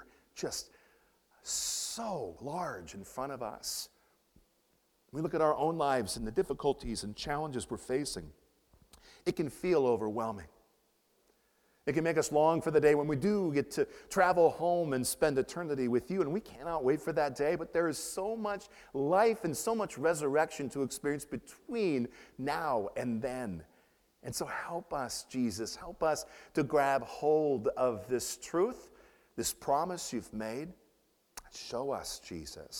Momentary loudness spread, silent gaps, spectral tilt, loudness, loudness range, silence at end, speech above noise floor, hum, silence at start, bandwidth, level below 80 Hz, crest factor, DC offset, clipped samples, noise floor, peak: 13 LU; none; -4.5 dB/octave; -33 LUFS; 8 LU; 0 s; 40 dB; none; 0 s; 18 kHz; -60 dBFS; 22 dB; under 0.1%; under 0.1%; -73 dBFS; -12 dBFS